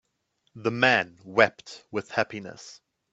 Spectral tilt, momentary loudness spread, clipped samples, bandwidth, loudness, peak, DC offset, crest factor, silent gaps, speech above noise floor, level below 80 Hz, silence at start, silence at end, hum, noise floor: -4.5 dB/octave; 22 LU; under 0.1%; 8 kHz; -25 LUFS; -2 dBFS; under 0.1%; 26 dB; none; 48 dB; -68 dBFS; 0.55 s; 0.4 s; none; -74 dBFS